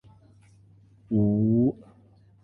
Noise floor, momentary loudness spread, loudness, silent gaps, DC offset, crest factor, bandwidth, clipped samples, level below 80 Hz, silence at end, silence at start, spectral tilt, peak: -57 dBFS; 8 LU; -24 LUFS; none; under 0.1%; 16 dB; 1.4 kHz; under 0.1%; -56 dBFS; 0.7 s; 1.1 s; -13 dB/octave; -12 dBFS